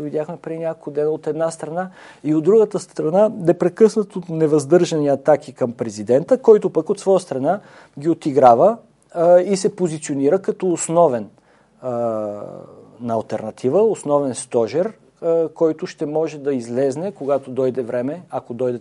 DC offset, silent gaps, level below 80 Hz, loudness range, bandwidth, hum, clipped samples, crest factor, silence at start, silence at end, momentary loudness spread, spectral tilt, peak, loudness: under 0.1%; none; -68 dBFS; 5 LU; 11.5 kHz; none; under 0.1%; 18 dB; 0 s; 0 s; 13 LU; -6.5 dB/octave; 0 dBFS; -19 LUFS